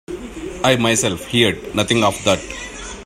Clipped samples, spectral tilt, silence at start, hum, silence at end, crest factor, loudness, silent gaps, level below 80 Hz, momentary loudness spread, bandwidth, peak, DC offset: under 0.1%; -3.5 dB/octave; 0.1 s; none; 0 s; 18 dB; -17 LUFS; none; -42 dBFS; 14 LU; 16 kHz; 0 dBFS; under 0.1%